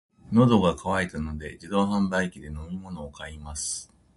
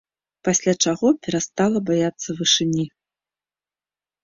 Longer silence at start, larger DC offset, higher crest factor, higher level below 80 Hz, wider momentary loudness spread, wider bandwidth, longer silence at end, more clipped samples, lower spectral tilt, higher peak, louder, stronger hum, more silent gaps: second, 0.25 s vs 0.45 s; neither; about the same, 18 dB vs 18 dB; first, -44 dBFS vs -60 dBFS; first, 18 LU vs 7 LU; first, 11.5 kHz vs 7.8 kHz; second, 0.3 s vs 1.35 s; neither; first, -5.5 dB/octave vs -3.5 dB/octave; second, -8 dBFS vs -4 dBFS; second, -26 LUFS vs -20 LUFS; neither; neither